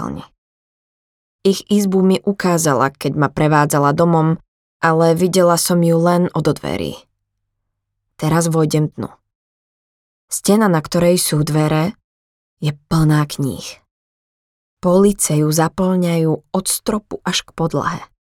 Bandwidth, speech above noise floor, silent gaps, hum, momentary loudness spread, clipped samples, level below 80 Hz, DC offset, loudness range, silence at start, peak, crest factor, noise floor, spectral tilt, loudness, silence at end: 17.5 kHz; 59 dB; 0.38-1.39 s, 4.48-4.80 s, 9.35-10.28 s, 12.04-12.57 s, 13.91-14.77 s; none; 10 LU; under 0.1%; -46 dBFS; under 0.1%; 6 LU; 0 s; 0 dBFS; 16 dB; -75 dBFS; -5.5 dB/octave; -16 LUFS; 0.3 s